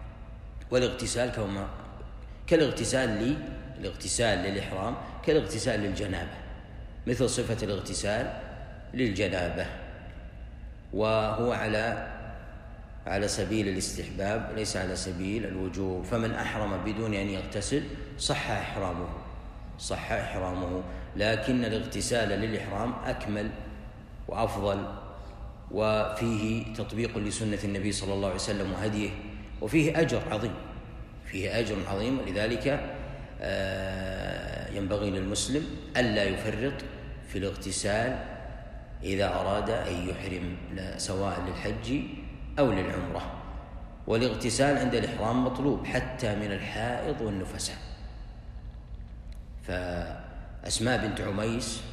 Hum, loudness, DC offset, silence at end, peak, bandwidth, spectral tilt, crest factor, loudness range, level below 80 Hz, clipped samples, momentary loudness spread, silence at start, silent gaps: none; -30 LUFS; under 0.1%; 0 s; -10 dBFS; 15 kHz; -5 dB/octave; 20 dB; 4 LU; -44 dBFS; under 0.1%; 17 LU; 0 s; none